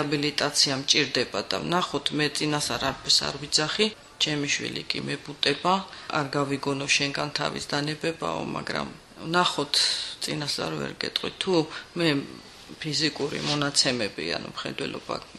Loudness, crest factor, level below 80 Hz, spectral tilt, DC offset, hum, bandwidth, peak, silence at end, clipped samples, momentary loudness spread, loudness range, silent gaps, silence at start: -26 LUFS; 22 dB; -58 dBFS; -3 dB/octave; under 0.1%; none; 13 kHz; -6 dBFS; 0 s; under 0.1%; 10 LU; 3 LU; none; 0 s